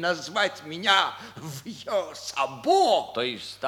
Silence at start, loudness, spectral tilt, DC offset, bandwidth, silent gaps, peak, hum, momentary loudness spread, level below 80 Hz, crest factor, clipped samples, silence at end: 0 s; -25 LUFS; -3 dB/octave; under 0.1%; 18.5 kHz; none; -6 dBFS; none; 16 LU; -70 dBFS; 22 dB; under 0.1%; 0 s